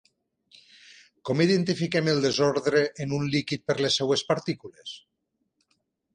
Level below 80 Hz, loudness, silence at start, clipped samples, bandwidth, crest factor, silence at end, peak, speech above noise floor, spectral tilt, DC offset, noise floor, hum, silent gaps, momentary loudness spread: -64 dBFS; -25 LUFS; 1.25 s; under 0.1%; 10 kHz; 20 dB; 1.15 s; -8 dBFS; 53 dB; -5 dB/octave; under 0.1%; -78 dBFS; none; none; 17 LU